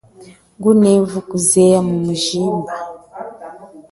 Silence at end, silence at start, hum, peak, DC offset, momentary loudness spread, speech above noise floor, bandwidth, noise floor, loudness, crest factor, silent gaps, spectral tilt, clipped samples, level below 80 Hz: 0.1 s; 0.2 s; none; 0 dBFS; under 0.1%; 21 LU; 21 dB; 12 kHz; -36 dBFS; -14 LUFS; 16 dB; none; -5 dB/octave; under 0.1%; -54 dBFS